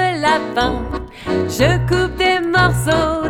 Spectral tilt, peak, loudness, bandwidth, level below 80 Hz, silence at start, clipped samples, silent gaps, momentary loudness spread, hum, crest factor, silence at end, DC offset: -5 dB/octave; -2 dBFS; -16 LUFS; 17 kHz; -30 dBFS; 0 s; under 0.1%; none; 8 LU; none; 16 dB; 0 s; under 0.1%